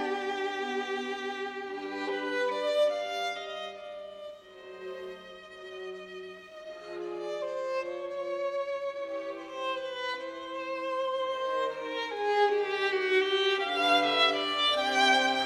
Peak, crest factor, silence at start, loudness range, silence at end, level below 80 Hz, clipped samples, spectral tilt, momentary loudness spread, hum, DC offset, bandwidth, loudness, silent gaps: -12 dBFS; 18 dB; 0 s; 14 LU; 0 s; -74 dBFS; under 0.1%; -1.5 dB/octave; 19 LU; none; under 0.1%; 14.5 kHz; -30 LUFS; none